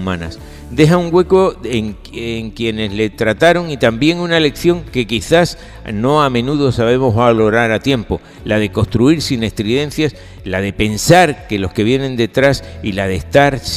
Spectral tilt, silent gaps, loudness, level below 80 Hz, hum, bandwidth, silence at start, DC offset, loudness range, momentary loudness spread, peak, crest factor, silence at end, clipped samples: -5.5 dB/octave; none; -14 LUFS; -34 dBFS; none; 16 kHz; 0 s; under 0.1%; 2 LU; 11 LU; 0 dBFS; 14 dB; 0 s; 0.2%